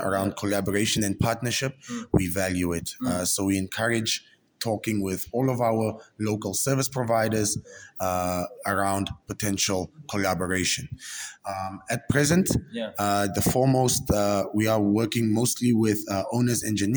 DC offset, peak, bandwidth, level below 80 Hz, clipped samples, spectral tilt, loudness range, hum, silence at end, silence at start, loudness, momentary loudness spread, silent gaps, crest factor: under 0.1%; -6 dBFS; over 20 kHz; -48 dBFS; under 0.1%; -4.5 dB/octave; 4 LU; none; 0 s; 0 s; -25 LUFS; 9 LU; none; 18 dB